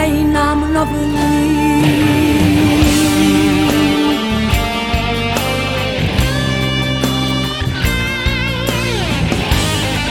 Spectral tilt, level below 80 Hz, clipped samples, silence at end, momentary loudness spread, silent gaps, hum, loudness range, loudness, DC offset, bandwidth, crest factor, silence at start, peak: -5 dB/octave; -24 dBFS; under 0.1%; 0 s; 5 LU; none; none; 4 LU; -14 LUFS; under 0.1%; 17.5 kHz; 14 dB; 0 s; 0 dBFS